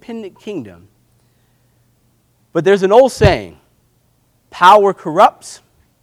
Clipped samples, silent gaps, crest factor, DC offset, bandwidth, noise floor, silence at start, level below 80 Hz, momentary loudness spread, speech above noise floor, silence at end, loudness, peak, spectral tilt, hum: 0.2%; none; 16 dB; under 0.1%; 16.5 kHz; -58 dBFS; 0.1 s; -36 dBFS; 21 LU; 46 dB; 0.5 s; -11 LUFS; 0 dBFS; -5.5 dB/octave; none